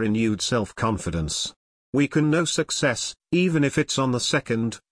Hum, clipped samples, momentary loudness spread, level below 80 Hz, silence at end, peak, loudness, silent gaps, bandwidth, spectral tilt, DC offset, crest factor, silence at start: none; under 0.1%; 6 LU; -46 dBFS; 0.15 s; -8 dBFS; -23 LUFS; 1.56-1.93 s; 10.5 kHz; -4.5 dB/octave; under 0.1%; 16 dB; 0 s